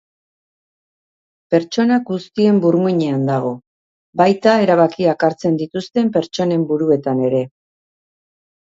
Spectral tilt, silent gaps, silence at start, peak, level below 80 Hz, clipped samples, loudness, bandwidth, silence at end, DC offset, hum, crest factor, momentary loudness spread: -7 dB/octave; 3.67-4.13 s; 1.5 s; 0 dBFS; -62 dBFS; under 0.1%; -16 LUFS; 7.8 kHz; 1.15 s; under 0.1%; none; 18 dB; 8 LU